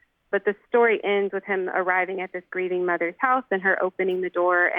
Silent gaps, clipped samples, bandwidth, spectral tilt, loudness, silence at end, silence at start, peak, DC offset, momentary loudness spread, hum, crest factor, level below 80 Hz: none; under 0.1%; 3.8 kHz; -8 dB/octave; -24 LUFS; 0 s; 0.3 s; -8 dBFS; under 0.1%; 8 LU; none; 16 dB; -74 dBFS